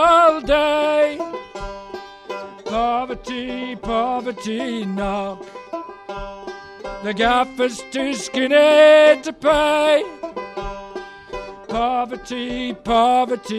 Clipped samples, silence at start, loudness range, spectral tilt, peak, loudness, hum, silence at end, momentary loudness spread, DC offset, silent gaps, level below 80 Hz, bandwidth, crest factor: under 0.1%; 0 s; 10 LU; -4 dB/octave; -2 dBFS; -18 LUFS; none; 0 s; 19 LU; under 0.1%; none; -42 dBFS; 12 kHz; 18 dB